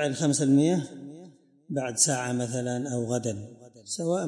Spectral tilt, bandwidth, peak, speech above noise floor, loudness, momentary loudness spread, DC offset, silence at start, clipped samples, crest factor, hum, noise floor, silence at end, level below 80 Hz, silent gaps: -4.5 dB/octave; 11.5 kHz; -8 dBFS; 25 dB; -26 LUFS; 18 LU; under 0.1%; 0 s; under 0.1%; 20 dB; none; -52 dBFS; 0 s; -72 dBFS; none